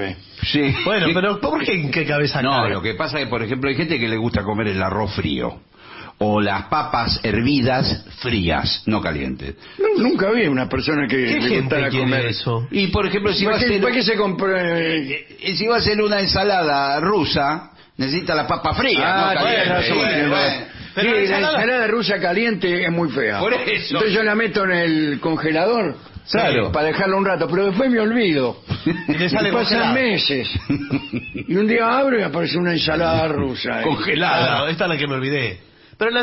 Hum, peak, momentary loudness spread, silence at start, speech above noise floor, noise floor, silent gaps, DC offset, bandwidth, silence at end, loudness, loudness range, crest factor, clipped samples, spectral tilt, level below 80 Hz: none; -4 dBFS; 6 LU; 0 s; 21 dB; -40 dBFS; none; under 0.1%; 6 kHz; 0 s; -19 LUFS; 3 LU; 16 dB; under 0.1%; -8.5 dB/octave; -42 dBFS